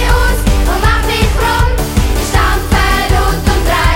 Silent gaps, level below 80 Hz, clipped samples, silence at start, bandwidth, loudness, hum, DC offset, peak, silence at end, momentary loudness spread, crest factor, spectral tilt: none; -14 dBFS; under 0.1%; 0 s; 17 kHz; -12 LUFS; none; under 0.1%; 0 dBFS; 0 s; 2 LU; 10 dB; -4.5 dB/octave